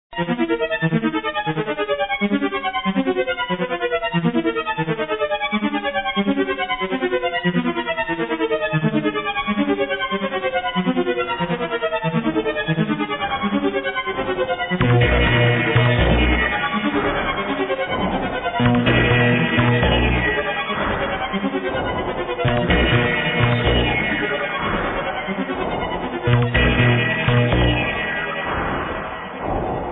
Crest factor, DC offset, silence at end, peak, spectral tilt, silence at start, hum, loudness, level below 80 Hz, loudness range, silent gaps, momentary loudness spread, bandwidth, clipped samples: 16 dB; under 0.1%; 0 s; -4 dBFS; -10 dB/octave; 0.1 s; none; -20 LUFS; -32 dBFS; 4 LU; none; 7 LU; 4 kHz; under 0.1%